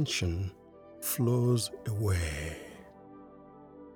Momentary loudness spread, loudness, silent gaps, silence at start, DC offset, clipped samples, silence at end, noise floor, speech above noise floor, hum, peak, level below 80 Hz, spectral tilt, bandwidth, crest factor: 24 LU; -32 LUFS; none; 0 s; under 0.1%; under 0.1%; 0 s; -52 dBFS; 22 dB; none; -16 dBFS; -48 dBFS; -5 dB/octave; over 20 kHz; 16 dB